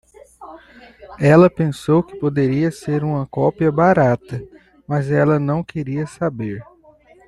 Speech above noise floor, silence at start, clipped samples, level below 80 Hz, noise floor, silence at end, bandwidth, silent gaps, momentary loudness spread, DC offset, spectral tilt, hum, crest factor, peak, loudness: 32 dB; 0.4 s; under 0.1%; -50 dBFS; -49 dBFS; 0.65 s; 12 kHz; none; 12 LU; under 0.1%; -8.5 dB/octave; none; 16 dB; -2 dBFS; -18 LUFS